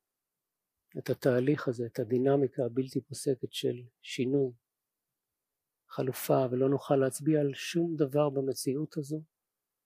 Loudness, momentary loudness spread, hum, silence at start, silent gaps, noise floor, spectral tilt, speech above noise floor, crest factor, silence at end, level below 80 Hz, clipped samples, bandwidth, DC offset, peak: -31 LUFS; 9 LU; none; 0.95 s; none; -89 dBFS; -6 dB/octave; 58 dB; 18 dB; 0.6 s; -80 dBFS; under 0.1%; 15.5 kHz; under 0.1%; -12 dBFS